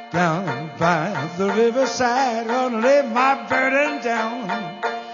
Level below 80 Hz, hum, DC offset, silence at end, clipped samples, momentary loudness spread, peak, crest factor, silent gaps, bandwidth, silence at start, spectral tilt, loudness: -66 dBFS; none; under 0.1%; 0 s; under 0.1%; 8 LU; -4 dBFS; 16 dB; none; 7.4 kHz; 0 s; -5 dB/octave; -20 LUFS